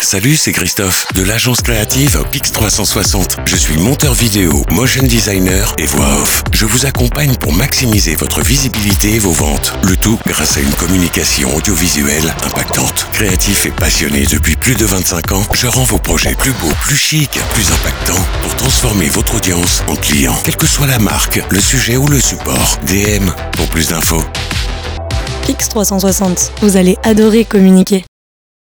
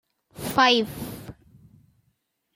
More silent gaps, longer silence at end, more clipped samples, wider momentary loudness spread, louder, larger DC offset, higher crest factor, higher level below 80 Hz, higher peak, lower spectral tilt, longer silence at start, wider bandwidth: neither; second, 0.6 s vs 1.25 s; neither; second, 4 LU vs 22 LU; first, -11 LUFS vs -21 LUFS; first, 0.1% vs under 0.1%; second, 12 dB vs 22 dB; first, -20 dBFS vs -56 dBFS; first, 0 dBFS vs -6 dBFS; about the same, -3.5 dB/octave vs -3.5 dB/octave; second, 0 s vs 0.35 s; first, over 20 kHz vs 16.5 kHz